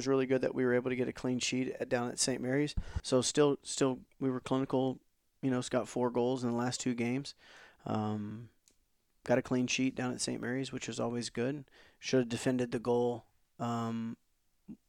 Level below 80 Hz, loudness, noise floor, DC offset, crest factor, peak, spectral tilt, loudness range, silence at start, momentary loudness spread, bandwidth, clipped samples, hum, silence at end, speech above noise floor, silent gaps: -54 dBFS; -34 LUFS; -75 dBFS; under 0.1%; 18 dB; -16 dBFS; -4.5 dB/octave; 4 LU; 0 s; 10 LU; 14.5 kHz; under 0.1%; none; 0.15 s; 42 dB; none